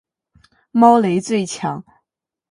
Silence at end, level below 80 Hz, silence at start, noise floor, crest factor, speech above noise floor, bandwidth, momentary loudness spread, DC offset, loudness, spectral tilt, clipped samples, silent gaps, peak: 0.7 s; -64 dBFS; 0.75 s; -82 dBFS; 18 dB; 67 dB; 11 kHz; 14 LU; under 0.1%; -16 LUFS; -6 dB/octave; under 0.1%; none; 0 dBFS